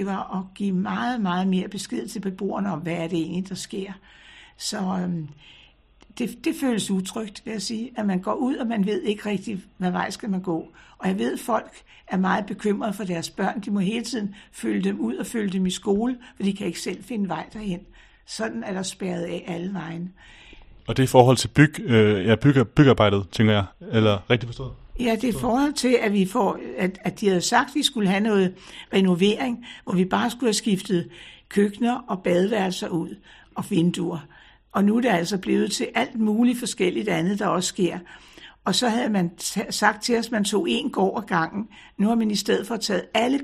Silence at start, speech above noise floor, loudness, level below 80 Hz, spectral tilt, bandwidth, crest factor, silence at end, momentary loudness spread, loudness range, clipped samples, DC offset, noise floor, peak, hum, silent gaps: 0 s; 31 dB; -24 LUFS; -52 dBFS; -5.5 dB/octave; 14 kHz; 24 dB; 0 s; 12 LU; 9 LU; under 0.1%; under 0.1%; -54 dBFS; 0 dBFS; none; none